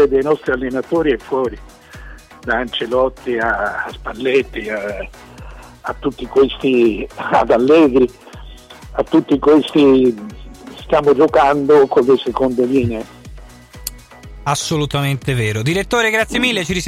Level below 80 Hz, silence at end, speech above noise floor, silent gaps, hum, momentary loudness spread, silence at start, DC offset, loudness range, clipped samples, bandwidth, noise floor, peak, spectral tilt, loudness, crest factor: -38 dBFS; 0 s; 22 dB; none; none; 17 LU; 0 s; under 0.1%; 6 LU; under 0.1%; 15 kHz; -37 dBFS; -4 dBFS; -5.5 dB/octave; -15 LUFS; 12 dB